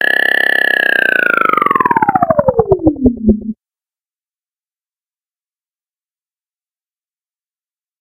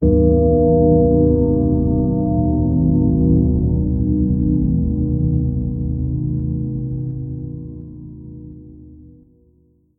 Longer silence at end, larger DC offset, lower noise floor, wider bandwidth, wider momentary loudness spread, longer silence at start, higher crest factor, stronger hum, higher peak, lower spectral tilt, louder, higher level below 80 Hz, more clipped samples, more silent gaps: first, 4.45 s vs 0.9 s; neither; first, under -90 dBFS vs -56 dBFS; first, 17.5 kHz vs 1.2 kHz; second, 4 LU vs 19 LU; about the same, 0 s vs 0 s; about the same, 16 dB vs 14 dB; neither; about the same, 0 dBFS vs -2 dBFS; second, -6 dB/octave vs -17 dB/octave; first, -11 LUFS vs -17 LUFS; second, -36 dBFS vs -24 dBFS; neither; neither